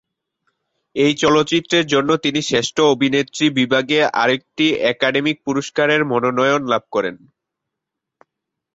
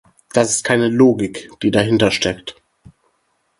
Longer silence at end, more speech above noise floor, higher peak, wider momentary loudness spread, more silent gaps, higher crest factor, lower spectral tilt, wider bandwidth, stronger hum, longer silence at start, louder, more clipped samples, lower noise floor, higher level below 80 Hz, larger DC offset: first, 1.6 s vs 1.1 s; first, 65 dB vs 50 dB; about the same, -2 dBFS vs 0 dBFS; second, 5 LU vs 11 LU; neither; about the same, 16 dB vs 18 dB; about the same, -4 dB/octave vs -4.5 dB/octave; second, 8 kHz vs 11.5 kHz; neither; first, 0.95 s vs 0.35 s; about the same, -17 LUFS vs -16 LUFS; neither; first, -82 dBFS vs -65 dBFS; second, -58 dBFS vs -48 dBFS; neither